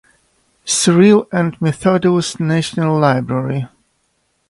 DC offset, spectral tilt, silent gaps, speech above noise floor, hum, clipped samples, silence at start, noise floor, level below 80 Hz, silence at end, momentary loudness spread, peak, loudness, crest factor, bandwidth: under 0.1%; -5.5 dB/octave; none; 50 dB; none; under 0.1%; 0.65 s; -64 dBFS; -52 dBFS; 0.85 s; 11 LU; 0 dBFS; -15 LUFS; 16 dB; 11.5 kHz